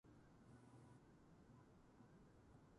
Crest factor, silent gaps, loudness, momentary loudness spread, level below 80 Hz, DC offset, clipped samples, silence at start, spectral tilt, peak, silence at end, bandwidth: 12 dB; none; -69 LUFS; 3 LU; -78 dBFS; under 0.1%; under 0.1%; 0.05 s; -7 dB/octave; -56 dBFS; 0 s; 11 kHz